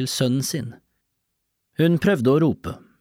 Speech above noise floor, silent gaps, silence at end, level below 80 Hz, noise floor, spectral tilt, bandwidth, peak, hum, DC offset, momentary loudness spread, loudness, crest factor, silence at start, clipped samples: 55 dB; none; 0.25 s; -54 dBFS; -76 dBFS; -5.5 dB/octave; 16.5 kHz; -8 dBFS; none; under 0.1%; 17 LU; -21 LUFS; 14 dB; 0 s; under 0.1%